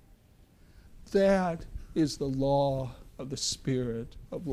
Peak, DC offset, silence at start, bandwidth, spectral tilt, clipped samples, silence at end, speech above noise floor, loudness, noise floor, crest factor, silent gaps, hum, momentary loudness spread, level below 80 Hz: -14 dBFS; under 0.1%; 0.75 s; 15 kHz; -5.5 dB/octave; under 0.1%; 0 s; 30 dB; -30 LUFS; -59 dBFS; 16 dB; none; none; 15 LU; -48 dBFS